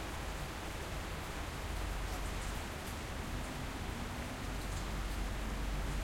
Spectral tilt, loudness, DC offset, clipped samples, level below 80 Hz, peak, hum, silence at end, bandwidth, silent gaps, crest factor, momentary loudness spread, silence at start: -4.5 dB/octave; -42 LUFS; under 0.1%; under 0.1%; -42 dBFS; -28 dBFS; none; 0 s; 16.5 kHz; none; 12 dB; 2 LU; 0 s